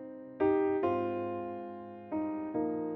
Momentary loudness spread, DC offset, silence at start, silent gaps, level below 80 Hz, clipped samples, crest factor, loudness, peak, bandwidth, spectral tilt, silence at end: 14 LU; under 0.1%; 0 s; none; -70 dBFS; under 0.1%; 16 dB; -33 LUFS; -18 dBFS; 3.9 kHz; -7 dB/octave; 0 s